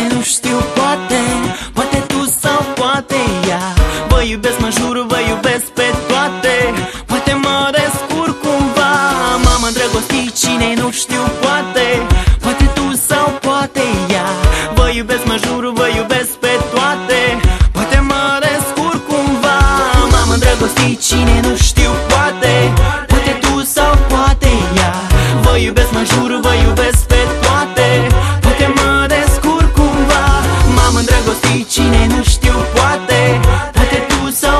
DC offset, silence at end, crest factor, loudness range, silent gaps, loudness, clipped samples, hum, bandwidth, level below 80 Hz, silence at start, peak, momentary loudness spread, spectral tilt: under 0.1%; 0 s; 12 dB; 3 LU; none; -12 LUFS; under 0.1%; none; 13 kHz; -18 dBFS; 0 s; 0 dBFS; 4 LU; -4.5 dB/octave